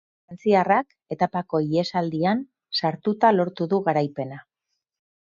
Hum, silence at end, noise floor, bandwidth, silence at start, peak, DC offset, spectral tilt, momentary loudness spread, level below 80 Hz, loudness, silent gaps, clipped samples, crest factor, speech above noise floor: none; 0.8 s; -81 dBFS; 7.4 kHz; 0.3 s; -6 dBFS; under 0.1%; -7 dB/octave; 9 LU; -66 dBFS; -23 LUFS; none; under 0.1%; 18 dB; 58 dB